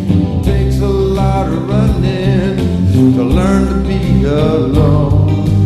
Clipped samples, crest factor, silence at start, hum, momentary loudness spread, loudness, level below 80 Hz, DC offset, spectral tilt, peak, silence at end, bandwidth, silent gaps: under 0.1%; 10 dB; 0 s; none; 4 LU; -12 LUFS; -20 dBFS; under 0.1%; -8.5 dB/octave; 0 dBFS; 0 s; 13 kHz; none